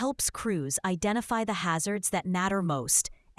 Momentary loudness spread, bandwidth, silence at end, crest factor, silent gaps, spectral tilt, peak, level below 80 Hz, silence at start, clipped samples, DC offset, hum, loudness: 5 LU; 12 kHz; 0.25 s; 20 dB; none; -3.5 dB/octave; -10 dBFS; -54 dBFS; 0 s; under 0.1%; under 0.1%; none; -28 LUFS